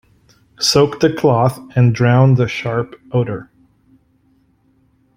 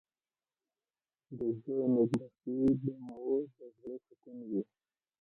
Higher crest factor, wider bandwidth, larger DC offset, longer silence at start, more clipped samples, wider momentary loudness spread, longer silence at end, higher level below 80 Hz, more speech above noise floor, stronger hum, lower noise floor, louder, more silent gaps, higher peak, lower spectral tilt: about the same, 16 dB vs 18 dB; first, 15.5 kHz vs 10.5 kHz; neither; second, 0.6 s vs 1.3 s; neither; second, 9 LU vs 19 LU; first, 1.75 s vs 0.6 s; first, -50 dBFS vs -68 dBFS; second, 43 dB vs over 55 dB; neither; second, -57 dBFS vs under -90 dBFS; first, -15 LUFS vs -34 LUFS; neither; first, -2 dBFS vs -18 dBFS; second, -6 dB/octave vs -9.5 dB/octave